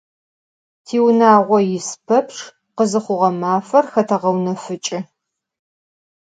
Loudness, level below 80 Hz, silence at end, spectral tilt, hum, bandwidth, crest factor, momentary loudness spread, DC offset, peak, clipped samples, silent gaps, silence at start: -17 LUFS; -70 dBFS; 1.25 s; -5.5 dB/octave; none; 9.4 kHz; 18 dB; 15 LU; under 0.1%; 0 dBFS; under 0.1%; none; 0.9 s